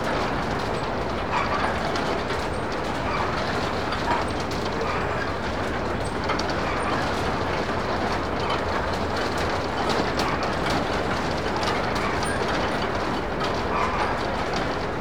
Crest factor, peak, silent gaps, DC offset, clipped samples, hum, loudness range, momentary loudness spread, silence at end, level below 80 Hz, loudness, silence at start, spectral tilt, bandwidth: 16 dB; -10 dBFS; none; 1%; under 0.1%; none; 1 LU; 3 LU; 0 s; -38 dBFS; -25 LUFS; 0 s; -5 dB/octave; over 20 kHz